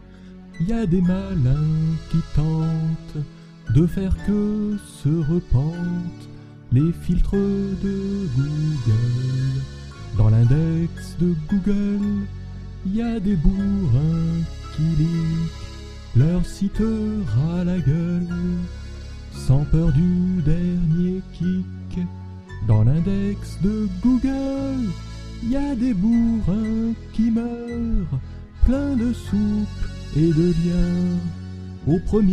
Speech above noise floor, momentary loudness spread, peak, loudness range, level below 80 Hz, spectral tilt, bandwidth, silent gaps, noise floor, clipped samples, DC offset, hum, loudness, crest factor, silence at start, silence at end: 21 dB; 12 LU; -4 dBFS; 2 LU; -30 dBFS; -9 dB/octave; 11 kHz; none; -41 dBFS; under 0.1%; under 0.1%; none; -22 LUFS; 18 dB; 0 s; 0 s